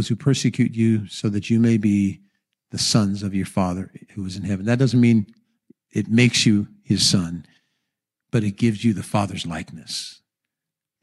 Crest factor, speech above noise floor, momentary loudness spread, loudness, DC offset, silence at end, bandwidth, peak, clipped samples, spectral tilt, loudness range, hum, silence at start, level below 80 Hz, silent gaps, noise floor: 16 dB; 66 dB; 14 LU; -21 LUFS; under 0.1%; 0.9 s; 12.5 kHz; -6 dBFS; under 0.1%; -5 dB/octave; 6 LU; none; 0 s; -56 dBFS; none; -86 dBFS